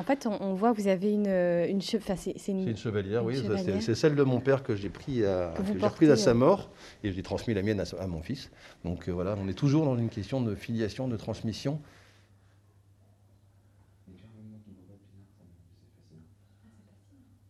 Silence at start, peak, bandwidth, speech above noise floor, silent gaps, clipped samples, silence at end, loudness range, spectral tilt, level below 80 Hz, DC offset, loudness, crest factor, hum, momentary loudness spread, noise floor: 0 s; -10 dBFS; 13 kHz; 33 dB; none; under 0.1%; 1.3 s; 11 LU; -7 dB/octave; -58 dBFS; under 0.1%; -29 LUFS; 20 dB; none; 12 LU; -61 dBFS